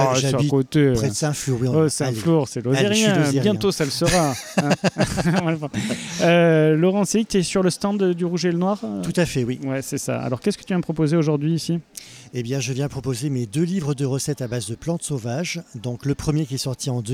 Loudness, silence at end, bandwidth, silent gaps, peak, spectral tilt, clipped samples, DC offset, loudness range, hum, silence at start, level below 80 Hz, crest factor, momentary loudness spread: -21 LUFS; 0 s; 16 kHz; none; -4 dBFS; -5.5 dB/octave; under 0.1%; under 0.1%; 6 LU; none; 0 s; -48 dBFS; 16 dB; 9 LU